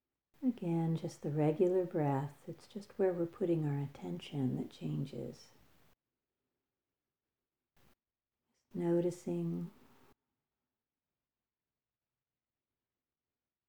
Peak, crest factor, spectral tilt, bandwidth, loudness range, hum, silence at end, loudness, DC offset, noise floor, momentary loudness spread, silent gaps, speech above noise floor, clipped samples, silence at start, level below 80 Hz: -20 dBFS; 18 dB; -8.5 dB/octave; 20 kHz; 13 LU; none; 4 s; -36 LUFS; under 0.1%; under -90 dBFS; 16 LU; none; over 54 dB; under 0.1%; 0.4 s; -78 dBFS